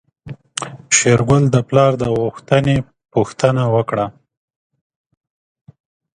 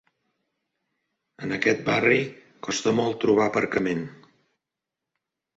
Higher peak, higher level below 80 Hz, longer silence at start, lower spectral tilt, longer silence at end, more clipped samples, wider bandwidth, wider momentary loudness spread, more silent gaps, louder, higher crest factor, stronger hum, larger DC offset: first, 0 dBFS vs -6 dBFS; first, -46 dBFS vs -64 dBFS; second, 0.25 s vs 1.4 s; about the same, -5 dB/octave vs -5 dB/octave; first, 2.05 s vs 1.45 s; neither; first, 11 kHz vs 8 kHz; about the same, 14 LU vs 14 LU; neither; first, -16 LUFS vs -23 LUFS; about the same, 18 dB vs 20 dB; neither; neither